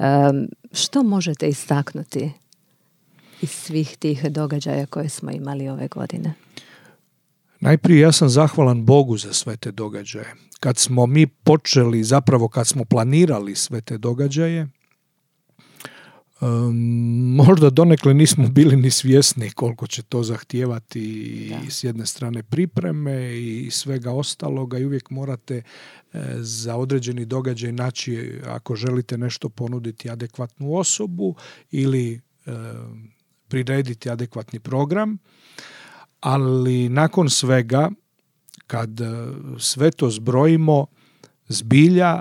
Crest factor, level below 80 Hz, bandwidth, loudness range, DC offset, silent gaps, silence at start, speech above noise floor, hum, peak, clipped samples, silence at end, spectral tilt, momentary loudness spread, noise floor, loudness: 20 dB; -76 dBFS; 16 kHz; 10 LU; under 0.1%; none; 0 s; 51 dB; none; 0 dBFS; under 0.1%; 0 s; -5.5 dB/octave; 17 LU; -69 dBFS; -19 LUFS